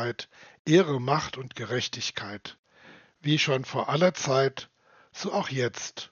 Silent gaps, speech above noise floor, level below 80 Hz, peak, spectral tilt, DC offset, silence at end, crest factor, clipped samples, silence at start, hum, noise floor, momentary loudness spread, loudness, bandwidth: 0.59-0.65 s, 2.59-2.63 s; 27 dB; -68 dBFS; -8 dBFS; -4 dB/octave; under 0.1%; 0.05 s; 20 dB; under 0.1%; 0 s; none; -54 dBFS; 18 LU; -27 LUFS; 7.2 kHz